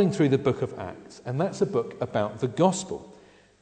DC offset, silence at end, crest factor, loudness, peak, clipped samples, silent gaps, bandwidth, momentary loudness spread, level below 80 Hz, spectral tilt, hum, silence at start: under 0.1%; 0.5 s; 20 dB; -26 LUFS; -8 dBFS; under 0.1%; none; 9.4 kHz; 15 LU; -62 dBFS; -6.5 dB/octave; none; 0 s